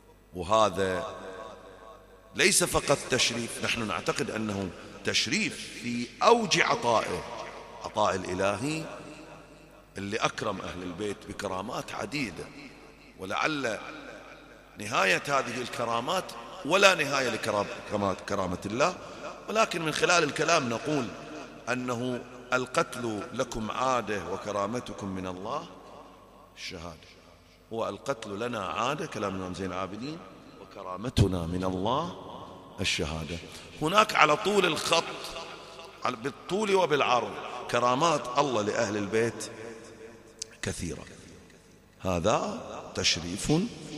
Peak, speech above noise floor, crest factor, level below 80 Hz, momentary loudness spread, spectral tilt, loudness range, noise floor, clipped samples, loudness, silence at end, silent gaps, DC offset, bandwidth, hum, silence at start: -2 dBFS; 27 dB; 28 dB; -54 dBFS; 19 LU; -3.5 dB/octave; 8 LU; -56 dBFS; under 0.1%; -28 LUFS; 0 s; none; under 0.1%; 15 kHz; none; 0.3 s